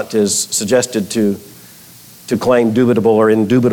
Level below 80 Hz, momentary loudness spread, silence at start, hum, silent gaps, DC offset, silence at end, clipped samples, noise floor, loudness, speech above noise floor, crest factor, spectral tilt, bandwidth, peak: -54 dBFS; 7 LU; 0 s; 60 Hz at -45 dBFS; none; under 0.1%; 0 s; under 0.1%; -40 dBFS; -14 LUFS; 27 dB; 12 dB; -4.5 dB/octave; 19 kHz; -2 dBFS